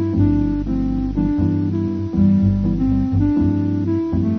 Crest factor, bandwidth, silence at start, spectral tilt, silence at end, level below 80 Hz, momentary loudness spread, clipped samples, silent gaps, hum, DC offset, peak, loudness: 12 dB; 6 kHz; 0 s; -11 dB/octave; 0 s; -30 dBFS; 5 LU; under 0.1%; none; none; 0.3%; -6 dBFS; -18 LUFS